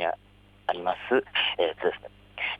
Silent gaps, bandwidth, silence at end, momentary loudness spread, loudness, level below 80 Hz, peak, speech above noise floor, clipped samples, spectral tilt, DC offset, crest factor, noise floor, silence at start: none; 5.2 kHz; 0 s; 16 LU; -28 LUFS; -60 dBFS; -10 dBFS; 28 dB; under 0.1%; -5.5 dB/octave; under 0.1%; 20 dB; -56 dBFS; 0 s